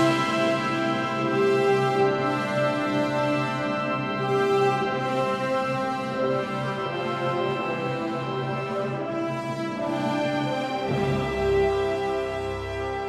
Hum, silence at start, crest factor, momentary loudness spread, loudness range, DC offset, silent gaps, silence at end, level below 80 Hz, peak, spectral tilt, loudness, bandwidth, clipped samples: none; 0 s; 16 dB; 7 LU; 4 LU; under 0.1%; none; 0 s; -50 dBFS; -10 dBFS; -6 dB/octave; -25 LUFS; 13.5 kHz; under 0.1%